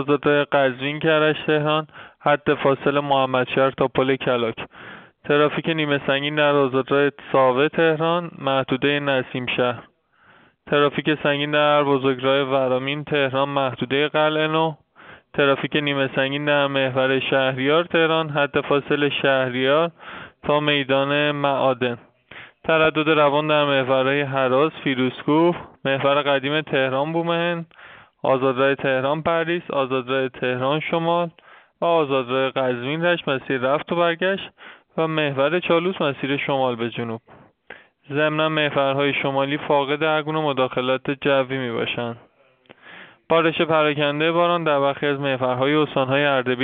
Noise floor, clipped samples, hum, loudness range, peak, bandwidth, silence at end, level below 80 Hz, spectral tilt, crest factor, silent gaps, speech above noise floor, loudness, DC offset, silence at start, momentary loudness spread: -55 dBFS; under 0.1%; none; 3 LU; -4 dBFS; 4.6 kHz; 0 s; -62 dBFS; -3.5 dB/octave; 18 dB; none; 35 dB; -20 LUFS; under 0.1%; 0 s; 6 LU